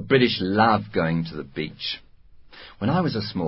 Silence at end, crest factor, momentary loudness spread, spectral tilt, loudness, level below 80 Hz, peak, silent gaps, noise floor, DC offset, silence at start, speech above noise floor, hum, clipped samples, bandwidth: 0 s; 18 dB; 12 LU; -10.5 dB/octave; -23 LUFS; -50 dBFS; -6 dBFS; none; -48 dBFS; under 0.1%; 0 s; 26 dB; none; under 0.1%; 5.8 kHz